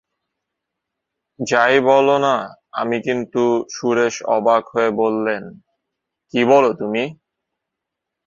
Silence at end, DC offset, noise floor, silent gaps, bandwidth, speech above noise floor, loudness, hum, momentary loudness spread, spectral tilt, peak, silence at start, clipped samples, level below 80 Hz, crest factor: 1.15 s; under 0.1%; -82 dBFS; none; 7.8 kHz; 65 dB; -18 LUFS; none; 11 LU; -4.5 dB/octave; -2 dBFS; 1.4 s; under 0.1%; -64 dBFS; 18 dB